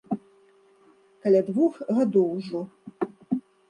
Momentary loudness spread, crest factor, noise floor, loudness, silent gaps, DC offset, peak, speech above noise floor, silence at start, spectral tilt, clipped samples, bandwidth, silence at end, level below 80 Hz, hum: 12 LU; 16 dB; -59 dBFS; -26 LUFS; none; under 0.1%; -10 dBFS; 36 dB; 0.1 s; -9 dB/octave; under 0.1%; 9.4 kHz; 0.3 s; -74 dBFS; none